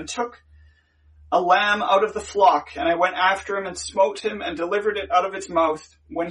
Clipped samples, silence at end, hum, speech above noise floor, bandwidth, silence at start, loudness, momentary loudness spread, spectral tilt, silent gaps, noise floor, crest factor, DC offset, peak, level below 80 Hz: under 0.1%; 0 s; none; 35 dB; 11.5 kHz; 0 s; -21 LUFS; 11 LU; -3 dB/octave; none; -56 dBFS; 18 dB; under 0.1%; -4 dBFS; -54 dBFS